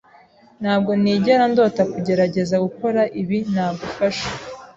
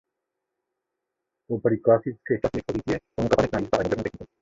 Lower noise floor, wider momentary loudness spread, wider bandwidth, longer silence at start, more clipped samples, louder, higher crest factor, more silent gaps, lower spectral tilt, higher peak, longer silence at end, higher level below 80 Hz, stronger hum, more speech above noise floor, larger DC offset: second, -50 dBFS vs -83 dBFS; about the same, 9 LU vs 8 LU; about the same, 7.8 kHz vs 7.8 kHz; second, 0.6 s vs 1.5 s; neither; first, -19 LUFS vs -25 LUFS; about the same, 16 dB vs 20 dB; neither; about the same, -6.5 dB/octave vs -7 dB/octave; about the same, -4 dBFS vs -6 dBFS; about the same, 0.05 s vs 0.15 s; about the same, -54 dBFS vs -50 dBFS; neither; second, 32 dB vs 59 dB; neither